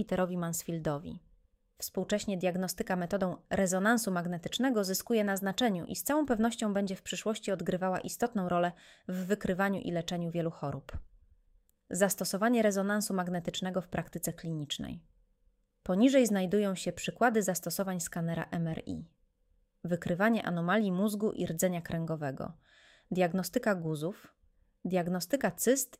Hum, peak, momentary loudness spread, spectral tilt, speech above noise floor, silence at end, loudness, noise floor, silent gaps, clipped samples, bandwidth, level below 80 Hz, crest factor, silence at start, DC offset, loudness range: none; -12 dBFS; 11 LU; -5 dB/octave; 40 dB; 0.15 s; -32 LUFS; -72 dBFS; none; under 0.1%; 16 kHz; -60 dBFS; 20 dB; 0 s; under 0.1%; 4 LU